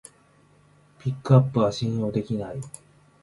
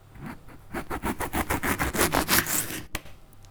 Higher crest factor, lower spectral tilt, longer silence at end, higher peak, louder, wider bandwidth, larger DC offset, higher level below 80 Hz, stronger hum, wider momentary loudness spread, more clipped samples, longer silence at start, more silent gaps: about the same, 22 dB vs 24 dB; first, -8 dB/octave vs -3 dB/octave; first, 0.55 s vs 0 s; about the same, -4 dBFS vs -4 dBFS; about the same, -24 LUFS vs -26 LUFS; second, 11.5 kHz vs over 20 kHz; neither; second, -56 dBFS vs -42 dBFS; neither; about the same, 18 LU vs 20 LU; neither; first, 1.05 s vs 0.1 s; neither